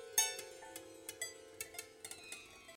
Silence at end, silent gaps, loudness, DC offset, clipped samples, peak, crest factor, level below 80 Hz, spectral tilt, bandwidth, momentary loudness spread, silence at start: 0 s; none; -43 LUFS; under 0.1%; under 0.1%; -18 dBFS; 26 dB; -78 dBFS; 1 dB/octave; 17 kHz; 16 LU; 0 s